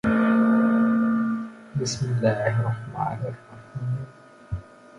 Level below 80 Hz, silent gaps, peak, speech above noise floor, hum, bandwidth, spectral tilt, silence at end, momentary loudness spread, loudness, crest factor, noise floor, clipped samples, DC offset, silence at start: -50 dBFS; none; -8 dBFS; 19 dB; none; 10.5 kHz; -7 dB/octave; 0.35 s; 17 LU; -24 LUFS; 16 dB; -44 dBFS; under 0.1%; under 0.1%; 0.05 s